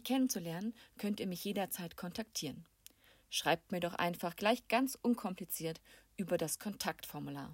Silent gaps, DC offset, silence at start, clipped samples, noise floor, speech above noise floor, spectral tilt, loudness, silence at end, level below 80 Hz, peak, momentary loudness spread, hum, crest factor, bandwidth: none; under 0.1%; 0.05 s; under 0.1%; -63 dBFS; 26 dB; -4 dB/octave; -38 LUFS; 0 s; -72 dBFS; -18 dBFS; 10 LU; none; 20 dB; 16.5 kHz